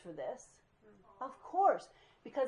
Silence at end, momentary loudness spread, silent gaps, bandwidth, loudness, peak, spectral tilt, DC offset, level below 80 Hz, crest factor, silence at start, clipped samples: 0 s; 18 LU; none; 10.5 kHz; -36 LUFS; -18 dBFS; -4.5 dB/octave; under 0.1%; -78 dBFS; 20 dB; 0.05 s; under 0.1%